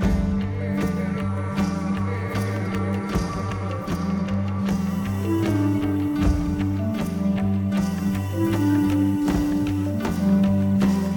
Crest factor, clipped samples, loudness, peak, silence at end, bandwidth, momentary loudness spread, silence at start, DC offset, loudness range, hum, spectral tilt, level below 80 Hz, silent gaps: 14 dB; under 0.1%; -23 LUFS; -8 dBFS; 0 s; 19 kHz; 6 LU; 0 s; under 0.1%; 4 LU; none; -7.5 dB/octave; -36 dBFS; none